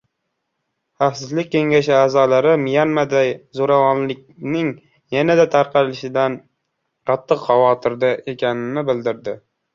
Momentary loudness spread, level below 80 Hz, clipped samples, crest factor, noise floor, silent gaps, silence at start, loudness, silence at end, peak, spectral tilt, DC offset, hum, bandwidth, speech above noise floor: 10 LU; -62 dBFS; under 0.1%; 16 dB; -75 dBFS; none; 1 s; -18 LUFS; 0.4 s; -2 dBFS; -6 dB/octave; under 0.1%; none; 7.4 kHz; 58 dB